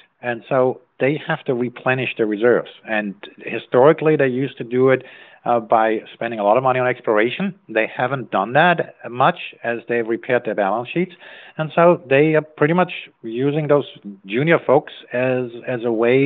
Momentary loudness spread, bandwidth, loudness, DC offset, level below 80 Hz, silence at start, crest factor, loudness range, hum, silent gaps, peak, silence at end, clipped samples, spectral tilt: 12 LU; 4.3 kHz; -19 LUFS; under 0.1%; -72 dBFS; 0.25 s; 18 dB; 2 LU; none; none; -2 dBFS; 0 s; under 0.1%; -5 dB/octave